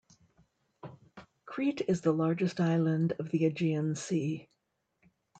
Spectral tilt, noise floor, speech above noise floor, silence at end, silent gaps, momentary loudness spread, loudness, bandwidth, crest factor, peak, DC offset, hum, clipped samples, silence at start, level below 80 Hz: -7 dB/octave; -80 dBFS; 50 dB; 0.95 s; none; 18 LU; -31 LUFS; 9 kHz; 18 dB; -16 dBFS; under 0.1%; none; under 0.1%; 0.85 s; -74 dBFS